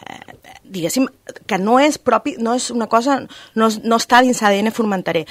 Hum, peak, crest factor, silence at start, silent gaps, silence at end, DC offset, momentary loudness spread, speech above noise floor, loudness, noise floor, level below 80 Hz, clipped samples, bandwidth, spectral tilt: none; 0 dBFS; 18 dB; 0.15 s; none; 0.05 s; under 0.1%; 13 LU; 24 dB; -17 LUFS; -41 dBFS; -58 dBFS; under 0.1%; 16 kHz; -4 dB/octave